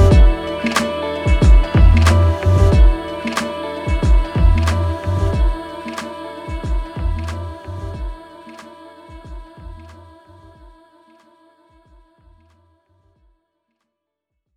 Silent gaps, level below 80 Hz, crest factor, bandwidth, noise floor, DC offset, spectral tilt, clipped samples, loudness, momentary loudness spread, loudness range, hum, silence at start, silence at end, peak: none; -18 dBFS; 16 dB; 11.5 kHz; -78 dBFS; under 0.1%; -6.5 dB/octave; under 0.1%; -17 LUFS; 25 LU; 20 LU; none; 0 s; 4.65 s; -2 dBFS